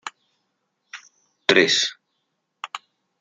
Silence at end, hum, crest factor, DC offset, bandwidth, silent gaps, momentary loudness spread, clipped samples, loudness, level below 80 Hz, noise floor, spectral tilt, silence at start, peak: 0.45 s; none; 24 dB; under 0.1%; 9.4 kHz; none; 26 LU; under 0.1%; -18 LUFS; -74 dBFS; -75 dBFS; -2 dB/octave; 0.05 s; -2 dBFS